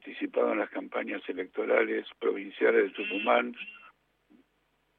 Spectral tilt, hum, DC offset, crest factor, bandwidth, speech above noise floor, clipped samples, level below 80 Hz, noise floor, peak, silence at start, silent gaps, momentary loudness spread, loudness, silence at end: -7 dB/octave; none; under 0.1%; 20 dB; 4.3 kHz; 44 dB; under 0.1%; -80 dBFS; -73 dBFS; -10 dBFS; 0.05 s; none; 10 LU; -29 LUFS; 1.1 s